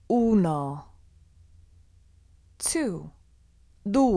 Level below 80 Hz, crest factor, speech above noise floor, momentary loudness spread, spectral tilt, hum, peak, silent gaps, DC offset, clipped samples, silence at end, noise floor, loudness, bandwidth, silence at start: -52 dBFS; 18 dB; 34 dB; 17 LU; -5.5 dB/octave; none; -10 dBFS; none; under 0.1%; under 0.1%; 0 s; -58 dBFS; -26 LUFS; 11 kHz; 0.1 s